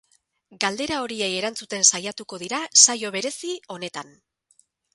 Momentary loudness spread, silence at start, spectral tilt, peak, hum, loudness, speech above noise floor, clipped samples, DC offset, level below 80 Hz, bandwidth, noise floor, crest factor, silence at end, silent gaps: 19 LU; 0.5 s; -0.5 dB/octave; 0 dBFS; none; -20 LUFS; 39 dB; under 0.1%; under 0.1%; -64 dBFS; 12 kHz; -63 dBFS; 26 dB; 0.9 s; none